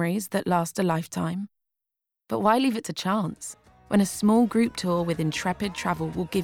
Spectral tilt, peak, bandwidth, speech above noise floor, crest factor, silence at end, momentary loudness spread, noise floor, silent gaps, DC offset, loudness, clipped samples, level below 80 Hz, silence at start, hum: -5.5 dB/octave; -8 dBFS; 17.5 kHz; 62 dB; 18 dB; 0 s; 10 LU; -87 dBFS; none; under 0.1%; -25 LUFS; under 0.1%; -56 dBFS; 0 s; none